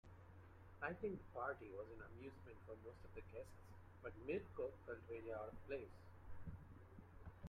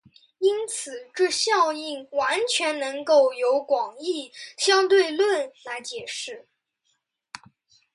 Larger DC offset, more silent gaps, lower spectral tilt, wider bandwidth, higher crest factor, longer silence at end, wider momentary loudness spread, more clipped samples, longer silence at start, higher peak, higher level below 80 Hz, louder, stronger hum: neither; neither; first, -8 dB/octave vs -0.5 dB/octave; first, 14.5 kHz vs 11.5 kHz; first, 22 dB vs 16 dB; second, 0 s vs 1.55 s; about the same, 15 LU vs 16 LU; neither; second, 0.05 s vs 0.4 s; second, -32 dBFS vs -8 dBFS; first, -66 dBFS vs -76 dBFS; second, -53 LUFS vs -23 LUFS; neither